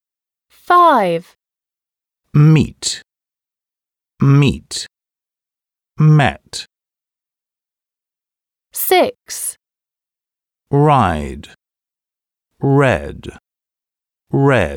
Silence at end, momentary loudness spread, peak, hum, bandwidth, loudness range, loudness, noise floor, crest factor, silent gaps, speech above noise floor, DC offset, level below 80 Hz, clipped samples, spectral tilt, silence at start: 0 s; 17 LU; 0 dBFS; none; 19.5 kHz; 6 LU; -15 LUFS; -89 dBFS; 18 dB; none; 76 dB; under 0.1%; -42 dBFS; under 0.1%; -6 dB/octave; 0.7 s